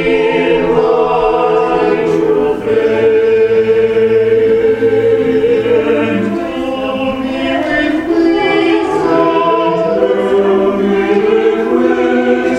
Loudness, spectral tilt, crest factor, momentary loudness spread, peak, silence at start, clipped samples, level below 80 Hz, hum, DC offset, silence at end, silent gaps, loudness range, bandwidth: -12 LUFS; -6.5 dB/octave; 12 dB; 5 LU; 0 dBFS; 0 s; under 0.1%; -40 dBFS; none; under 0.1%; 0 s; none; 3 LU; 8.8 kHz